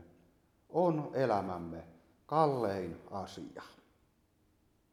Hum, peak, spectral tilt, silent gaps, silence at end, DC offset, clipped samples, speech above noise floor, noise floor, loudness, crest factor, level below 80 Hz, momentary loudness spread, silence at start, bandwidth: none; -14 dBFS; -7.5 dB/octave; none; 1.2 s; under 0.1%; under 0.1%; 38 dB; -72 dBFS; -34 LUFS; 22 dB; -70 dBFS; 18 LU; 0 s; 14.5 kHz